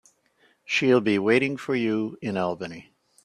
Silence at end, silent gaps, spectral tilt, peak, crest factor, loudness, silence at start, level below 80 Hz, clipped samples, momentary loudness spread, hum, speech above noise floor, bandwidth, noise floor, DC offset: 0.45 s; none; -5.5 dB/octave; -6 dBFS; 18 dB; -24 LUFS; 0.7 s; -68 dBFS; under 0.1%; 13 LU; none; 40 dB; 11 kHz; -64 dBFS; under 0.1%